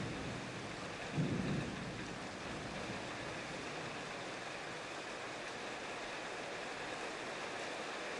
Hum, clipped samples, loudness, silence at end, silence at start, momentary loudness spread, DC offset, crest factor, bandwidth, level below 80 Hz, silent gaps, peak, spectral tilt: none; under 0.1%; -43 LUFS; 0 s; 0 s; 5 LU; under 0.1%; 18 dB; 11.5 kHz; -64 dBFS; none; -26 dBFS; -4.5 dB/octave